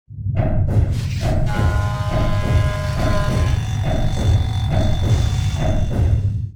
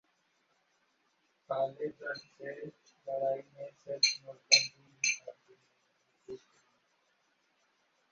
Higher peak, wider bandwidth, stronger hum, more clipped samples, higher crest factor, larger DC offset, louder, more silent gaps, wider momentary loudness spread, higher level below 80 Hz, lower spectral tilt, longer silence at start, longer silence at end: about the same, -6 dBFS vs -8 dBFS; first, 15 kHz vs 7.6 kHz; neither; neither; second, 12 dB vs 30 dB; first, 0.3% vs under 0.1%; first, -20 LUFS vs -32 LUFS; neither; second, 3 LU vs 25 LU; first, -22 dBFS vs -86 dBFS; first, -7 dB/octave vs 1 dB/octave; second, 0.1 s vs 1.5 s; second, 0 s vs 1.75 s